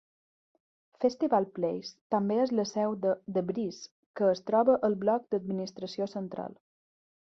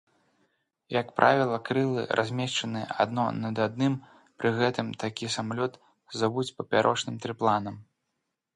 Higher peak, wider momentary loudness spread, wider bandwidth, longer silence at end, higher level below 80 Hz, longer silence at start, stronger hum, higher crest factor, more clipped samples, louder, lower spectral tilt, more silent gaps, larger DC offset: second, -12 dBFS vs -4 dBFS; first, 12 LU vs 9 LU; second, 7.4 kHz vs 11.5 kHz; about the same, 0.7 s vs 0.75 s; second, -74 dBFS vs -68 dBFS; about the same, 1 s vs 0.9 s; neither; second, 18 dB vs 24 dB; neither; about the same, -30 LUFS vs -28 LUFS; first, -6.5 dB/octave vs -5 dB/octave; first, 2.01-2.10 s, 3.91-4.14 s vs none; neither